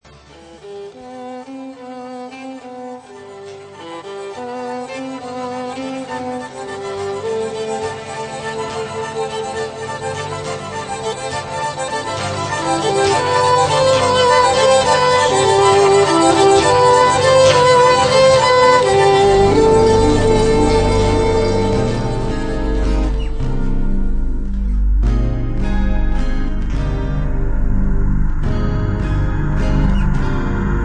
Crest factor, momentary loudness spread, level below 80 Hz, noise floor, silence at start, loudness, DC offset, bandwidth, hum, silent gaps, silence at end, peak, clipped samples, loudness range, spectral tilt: 14 dB; 20 LU; -22 dBFS; -42 dBFS; 0.45 s; -16 LUFS; under 0.1%; 9.8 kHz; none; none; 0 s; 0 dBFS; under 0.1%; 17 LU; -5 dB/octave